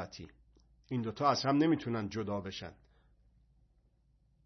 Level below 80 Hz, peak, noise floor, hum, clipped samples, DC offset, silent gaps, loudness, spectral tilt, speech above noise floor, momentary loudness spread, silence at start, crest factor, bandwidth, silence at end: -68 dBFS; -14 dBFS; -71 dBFS; none; under 0.1%; under 0.1%; none; -33 LUFS; -5 dB/octave; 37 dB; 20 LU; 0 s; 22 dB; 6.2 kHz; 1.7 s